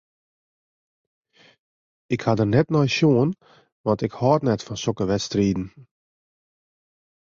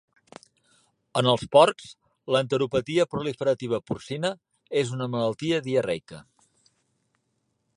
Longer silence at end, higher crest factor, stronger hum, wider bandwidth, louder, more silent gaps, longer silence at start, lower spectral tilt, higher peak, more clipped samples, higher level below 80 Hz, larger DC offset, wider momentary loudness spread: about the same, 1.55 s vs 1.55 s; about the same, 20 dB vs 24 dB; neither; second, 7.6 kHz vs 11.5 kHz; first, -22 LUFS vs -25 LUFS; first, 3.72-3.84 s vs none; first, 2.1 s vs 1.15 s; about the same, -6.5 dB/octave vs -5.5 dB/octave; about the same, -6 dBFS vs -4 dBFS; neither; first, -52 dBFS vs -62 dBFS; neither; second, 11 LU vs 14 LU